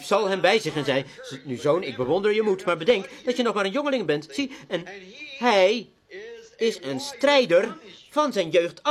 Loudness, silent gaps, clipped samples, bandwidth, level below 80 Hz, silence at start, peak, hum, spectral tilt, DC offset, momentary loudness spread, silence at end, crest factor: -23 LUFS; none; under 0.1%; 14 kHz; -66 dBFS; 0 s; -4 dBFS; none; -4.5 dB/octave; under 0.1%; 18 LU; 0 s; 20 dB